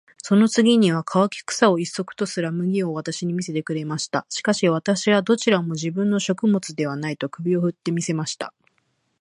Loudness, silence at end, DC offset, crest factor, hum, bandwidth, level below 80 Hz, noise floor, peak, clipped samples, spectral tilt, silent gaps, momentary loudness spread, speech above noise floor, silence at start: -22 LUFS; 0.7 s; under 0.1%; 22 dB; none; 11 kHz; -70 dBFS; -69 dBFS; 0 dBFS; under 0.1%; -5 dB/octave; none; 9 LU; 48 dB; 0.25 s